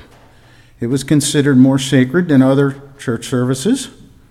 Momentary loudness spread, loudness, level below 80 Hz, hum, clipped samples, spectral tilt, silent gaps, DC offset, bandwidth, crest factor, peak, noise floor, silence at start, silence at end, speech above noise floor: 12 LU; -14 LUFS; -48 dBFS; none; under 0.1%; -5.5 dB/octave; none; under 0.1%; 14.5 kHz; 14 dB; 0 dBFS; -45 dBFS; 0.8 s; 0.4 s; 32 dB